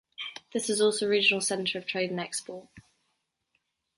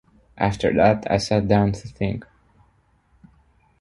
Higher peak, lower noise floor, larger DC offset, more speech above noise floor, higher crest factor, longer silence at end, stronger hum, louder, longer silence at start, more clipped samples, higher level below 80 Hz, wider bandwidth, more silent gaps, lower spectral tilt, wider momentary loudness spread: second, -10 dBFS vs -2 dBFS; first, -79 dBFS vs -61 dBFS; neither; first, 50 dB vs 41 dB; about the same, 20 dB vs 20 dB; second, 1.15 s vs 1.55 s; neither; second, -27 LUFS vs -21 LUFS; second, 0.2 s vs 0.35 s; neither; second, -74 dBFS vs -44 dBFS; about the same, 12 kHz vs 11.5 kHz; neither; second, -2.5 dB/octave vs -6.5 dB/octave; first, 16 LU vs 9 LU